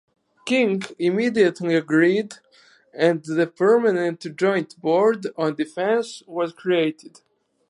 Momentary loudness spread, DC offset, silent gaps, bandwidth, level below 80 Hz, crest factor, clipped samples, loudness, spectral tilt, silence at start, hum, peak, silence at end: 8 LU; under 0.1%; none; 11.5 kHz; -76 dBFS; 16 dB; under 0.1%; -21 LUFS; -6 dB/octave; 0.45 s; none; -4 dBFS; 0.6 s